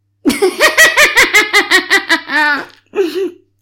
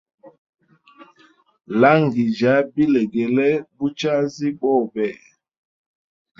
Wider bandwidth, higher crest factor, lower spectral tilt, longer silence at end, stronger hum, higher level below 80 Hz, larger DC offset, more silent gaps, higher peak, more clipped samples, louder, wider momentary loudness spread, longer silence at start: first, 17 kHz vs 7.4 kHz; second, 12 dB vs 20 dB; second, -0.5 dB/octave vs -7 dB/octave; second, 0.3 s vs 1.25 s; neither; first, -46 dBFS vs -64 dBFS; neither; second, none vs 0.38-0.53 s; about the same, 0 dBFS vs 0 dBFS; neither; first, -10 LUFS vs -19 LUFS; about the same, 12 LU vs 10 LU; about the same, 0.25 s vs 0.25 s